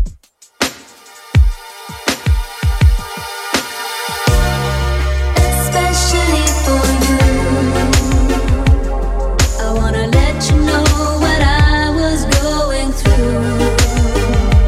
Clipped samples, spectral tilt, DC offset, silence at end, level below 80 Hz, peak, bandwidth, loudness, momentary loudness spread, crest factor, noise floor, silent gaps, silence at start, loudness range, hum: under 0.1%; -5 dB/octave; under 0.1%; 0 s; -16 dBFS; 0 dBFS; 15.5 kHz; -14 LUFS; 7 LU; 12 dB; -41 dBFS; none; 0 s; 4 LU; none